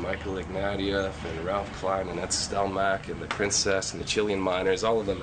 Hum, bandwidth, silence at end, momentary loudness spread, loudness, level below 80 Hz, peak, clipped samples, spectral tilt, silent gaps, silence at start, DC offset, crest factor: none; 9.4 kHz; 0 s; 7 LU; -28 LUFS; -46 dBFS; -12 dBFS; under 0.1%; -3.5 dB/octave; none; 0 s; under 0.1%; 16 dB